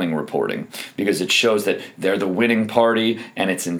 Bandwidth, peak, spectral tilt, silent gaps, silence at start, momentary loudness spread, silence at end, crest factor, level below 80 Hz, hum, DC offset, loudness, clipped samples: over 20 kHz; -2 dBFS; -4 dB/octave; none; 0 s; 8 LU; 0 s; 18 dB; -72 dBFS; none; under 0.1%; -20 LUFS; under 0.1%